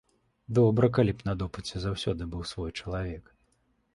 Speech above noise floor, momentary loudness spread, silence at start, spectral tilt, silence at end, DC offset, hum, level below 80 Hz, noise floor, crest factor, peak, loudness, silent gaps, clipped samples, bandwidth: 43 dB; 13 LU; 0.5 s; -7 dB/octave; 0.75 s; under 0.1%; none; -46 dBFS; -71 dBFS; 20 dB; -8 dBFS; -29 LUFS; none; under 0.1%; 11.5 kHz